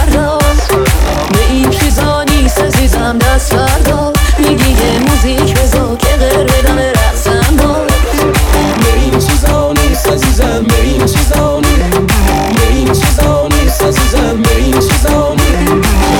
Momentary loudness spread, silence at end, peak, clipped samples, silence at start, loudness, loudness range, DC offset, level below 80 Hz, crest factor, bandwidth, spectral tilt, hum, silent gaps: 1 LU; 0 s; 0 dBFS; under 0.1%; 0 s; -10 LUFS; 0 LU; 0.4%; -12 dBFS; 8 dB; 19 kHz; -5 dB/octave; none; none